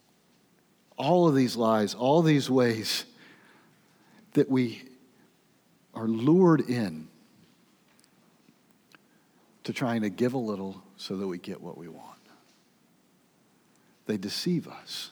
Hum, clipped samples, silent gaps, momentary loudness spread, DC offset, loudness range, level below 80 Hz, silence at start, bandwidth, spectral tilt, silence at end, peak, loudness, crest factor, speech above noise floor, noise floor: none; under 0.1%; none; 21 LU; under 0.1%; 14 LU; -82 dBFS; 1 s; over 20 kHz; -6 dB/octave; 0 s; -10 dBFS; -27 LUFS; 20 dB; 39 dB; -65 dBFS